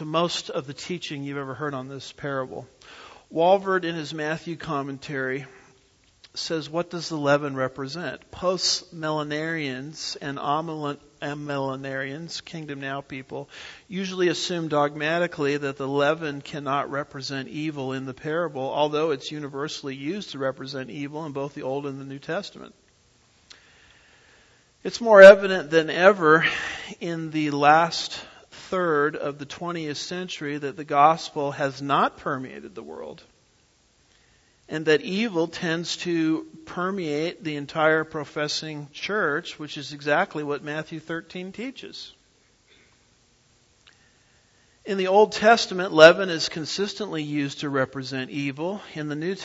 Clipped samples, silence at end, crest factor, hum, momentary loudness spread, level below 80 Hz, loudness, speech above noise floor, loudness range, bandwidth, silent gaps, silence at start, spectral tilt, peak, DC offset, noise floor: under 0.1%; 0 s; 24 dB; none; 16 LU; -64 dBFS; -24 LUFS; 38 dB; 14 LU; 8 kHz; none; 0 s; -4.5 dB/octave; 0 dBFS; under 0.1%; -62 dBFS